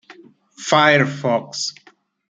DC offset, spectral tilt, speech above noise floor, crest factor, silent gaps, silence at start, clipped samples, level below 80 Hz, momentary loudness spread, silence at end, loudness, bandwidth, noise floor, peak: under 0.1%; -4 dB/octave; 29 dB; 18 dB; none; 0.1 s; under 0.1%; -64 dBFS; 13 LU; 0.6 s; -17 LUFS; 9.4 kHz; -46 dBFS; -2 dBFS